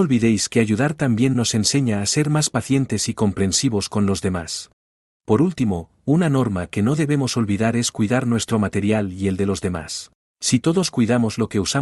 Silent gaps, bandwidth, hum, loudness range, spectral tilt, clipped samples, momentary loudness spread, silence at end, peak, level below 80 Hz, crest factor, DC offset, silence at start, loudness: 4.73-5.20 s, 10.15-10.36 s; 12 kHz; none; 2 LU; -5 dB/octave; under 0.1%; 6 LU; 0 s; -4 dBFS; -52 dBFS; 16 dB; under 0.1%; 0 s; -20 LUFS